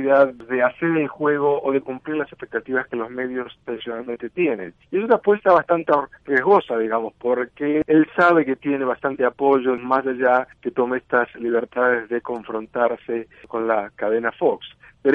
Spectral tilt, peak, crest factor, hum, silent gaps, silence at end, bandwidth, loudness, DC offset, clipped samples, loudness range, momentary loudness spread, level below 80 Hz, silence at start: -8 dB/octave; -4 dBFS; 18 dB; none; none; 0 s; 5.4 kHz; -21 LUFS; under 0.1%; under 0.1%; 5 LU; 12 LU; -62 dBFS; 0 s